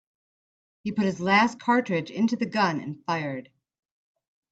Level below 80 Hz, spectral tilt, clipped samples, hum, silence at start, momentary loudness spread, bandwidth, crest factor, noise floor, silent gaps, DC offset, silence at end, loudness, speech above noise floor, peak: -70 dBFS; -5.5 dB/octave; under 0.1%; none; 0.85 s; 12 LU; 8 kHz; 18 dB; under -90 dBFS; none; under 0.1%; 1.1 s; -25 LUFS; over 65 dB; -8 dBFS